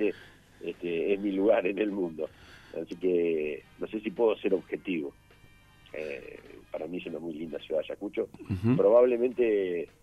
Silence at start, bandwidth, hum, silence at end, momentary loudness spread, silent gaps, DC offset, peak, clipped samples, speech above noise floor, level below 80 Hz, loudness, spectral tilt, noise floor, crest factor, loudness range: 0 s; 12.5 kHz; 50 Hz at -65 dBFS; 0.15 s; 16 LU; none; under 0.1%; -10 dBFS; under 0.1%; 28 dB; -64 dBFS; -29 LUFS; -8 dB/octave; -57 dBFS; 18 dB; 9 LU